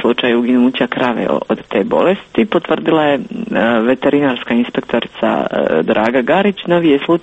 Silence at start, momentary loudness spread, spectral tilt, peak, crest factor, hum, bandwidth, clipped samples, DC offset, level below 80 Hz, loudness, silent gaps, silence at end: 0 s; 5 LU; -7.5 dB/octave; 0 dBFS; 14 dB; none; 8 kHz; under 0.1%; under 0.1%; -52 dBFS; -14 LUFS; none; 0 s